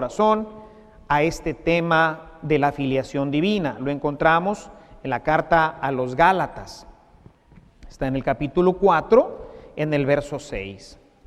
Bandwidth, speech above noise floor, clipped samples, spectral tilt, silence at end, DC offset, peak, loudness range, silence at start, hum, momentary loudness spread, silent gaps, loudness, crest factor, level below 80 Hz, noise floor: 14 kHz; 30 dB; under 0.1%; -6.5 dB/octave; 0.3 s; under 0.1%; -2 dBFS; 2 LU; 0 s; none; 15 LU; none; -21 LUFS; 20 dB; -44 dBFS; -52 dBFS